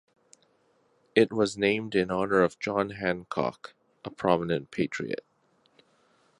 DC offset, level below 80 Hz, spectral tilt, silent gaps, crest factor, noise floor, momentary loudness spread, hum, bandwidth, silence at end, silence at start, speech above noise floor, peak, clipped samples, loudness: under 0.1%; -62 dBFS; -5.5 dB/octave; none; 24 dB; -68 dBFS; 13 LU; none; 11 kHz; 1.25 s; 1.15 s; 40 dB; -6 dBFS; under 0.1%; -28 LUFS